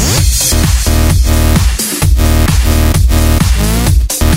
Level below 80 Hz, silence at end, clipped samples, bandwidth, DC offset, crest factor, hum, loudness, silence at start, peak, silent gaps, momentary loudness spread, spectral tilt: -12 dBFS; 0 s; under 0.1%; 16.5 kHz; 0.4%; 8 dB; none; -10 LUFS; 0 s; 0 dBFS; none; 2 LU; -4.5 dB/octave